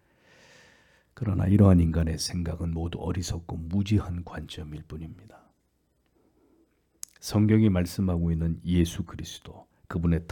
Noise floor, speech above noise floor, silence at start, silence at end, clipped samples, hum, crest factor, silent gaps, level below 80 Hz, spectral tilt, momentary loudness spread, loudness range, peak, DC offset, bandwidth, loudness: -71 dBFS; 45 dB; 1.2 s; 0.05 s; under 0.1%; none; 20 dB; none; -46 dBFS; -7 dB/octave; 19 LU; 8 LU; -8 dBFS; under 0.1%; 18 kHz; -26 LUFS